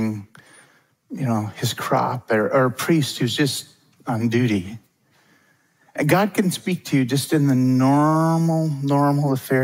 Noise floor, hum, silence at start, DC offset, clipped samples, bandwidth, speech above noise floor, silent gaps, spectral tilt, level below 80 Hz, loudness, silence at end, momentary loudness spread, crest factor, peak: -60 dBFS; none; 0 s; under 0.1%; under 0.1%; 16 kHz; 41 dB; none; -6 dB/octave; -66 dBFS; -20 LUFS; 0 s; 10 LU; 18 dB; -4 dBFS